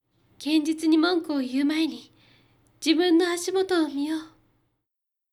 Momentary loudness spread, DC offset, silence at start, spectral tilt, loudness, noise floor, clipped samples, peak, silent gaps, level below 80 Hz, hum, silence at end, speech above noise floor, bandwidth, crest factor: 9 LU; under 0.1%; 0.4 s; -2.5 dB/octave; -24 LUFS; -85 dBFS; under 0.1%; -10 dBFS; none; -72 dBFS; none; 1.05 s; 61 dB; 14.5 kHz; 16 dB